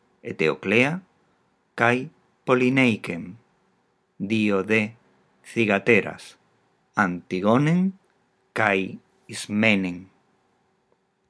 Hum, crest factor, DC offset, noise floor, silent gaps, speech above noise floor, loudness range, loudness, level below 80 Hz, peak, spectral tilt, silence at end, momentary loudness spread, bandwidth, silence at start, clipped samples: none; 24 dB; under 0.1%; -68 dBFS; none; 46 dB; 2 LU; -22 LUFS; -72 dBFS; -2 dBFS; -6 dB/octave; 1.25 s; 16 LU; 11 kHz; 0.25 s; under 0.1%